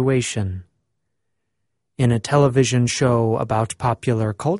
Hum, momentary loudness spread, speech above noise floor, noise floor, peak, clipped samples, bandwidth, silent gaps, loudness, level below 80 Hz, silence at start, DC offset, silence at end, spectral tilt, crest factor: none; 8 LU; 59 dB; -78 dBFS; -2 dBFS; under 0.1%; 11.5 kHz; none; -20 LUFS; -50 dBFS; 0 s; under 0.1%; 0 s; -6 dB/octave; 18 dB